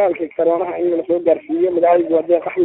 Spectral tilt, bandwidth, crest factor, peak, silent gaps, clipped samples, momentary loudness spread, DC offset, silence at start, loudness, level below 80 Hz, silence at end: -11.5 dB/octave; 4 kHz; 14 dB; -2 dBFS; none; under 0.1%; 5 LU; under 0.1%; 0 s; -17 LUFS; -64 dBFS; 0 s